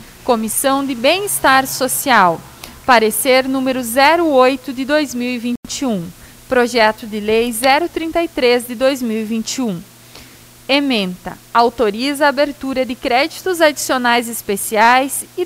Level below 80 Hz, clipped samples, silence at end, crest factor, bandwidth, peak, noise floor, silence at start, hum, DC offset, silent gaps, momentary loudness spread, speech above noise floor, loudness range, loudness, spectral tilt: -48 dBFS; under 0.1%; 0 s; 16 dB; 16 kHz; 0 dBFS; -41 dBFS; 0 s; none; under 0.1%; 5.57-5.63 s; 9 LU; 25 dB; 5 LU; -15 LUFS; -3 dB/octave